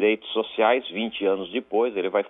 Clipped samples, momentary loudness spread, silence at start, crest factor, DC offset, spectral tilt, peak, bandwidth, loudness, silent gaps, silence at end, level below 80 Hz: under 0.1%; 6 LU; 0 s; 16 dB; under 0.1%; -8 dB/octave; -6 dBFS; 3.9 kHz; -24 LUFS; none; 0 s; -68 dBFS